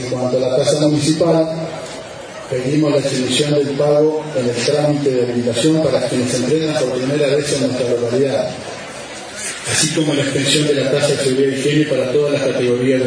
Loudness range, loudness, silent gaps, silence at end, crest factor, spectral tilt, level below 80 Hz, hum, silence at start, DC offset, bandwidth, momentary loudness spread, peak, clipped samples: 2 LU; -16 LUFS; none; 0 s; 14 dB; -4.5 dB/octave; -54 dBFS; none; 0 s; under 0.1%; 10.5 kHz; 10 LU; -2 dBFS; under 0.1%